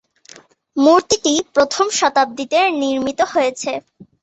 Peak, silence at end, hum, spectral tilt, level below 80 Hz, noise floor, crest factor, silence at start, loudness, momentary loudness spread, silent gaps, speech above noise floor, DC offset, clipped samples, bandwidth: -2 dBFS; 0.4 s; none; -2 dB/octave; -56 dBFS; -45 dBFS; 16 dB; 0.75 s; -16 LUFS; 10 LU; none; 29 dB; under 0.1%; under 0.1%; 8.2 kHz